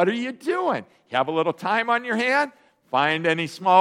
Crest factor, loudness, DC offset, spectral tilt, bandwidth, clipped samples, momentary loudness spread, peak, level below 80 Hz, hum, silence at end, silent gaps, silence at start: 18 dB; -23 LUFS; under 0.1%; -5 dB/octave; 15 kHz; under 0.1%; 6 LU; -4 dBFS; -74 dBFS; none; 0 s; none; 0 s